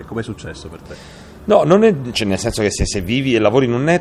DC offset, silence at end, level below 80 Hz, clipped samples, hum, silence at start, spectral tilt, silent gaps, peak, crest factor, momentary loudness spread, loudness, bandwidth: under 0.1%; 0 s; -34 dBFS; under 0.1%; none; 0 s; -5.5 dB/octave; none; 0 dBFS; 16 dB; 22 LU; -16 LUFS; 15 kHz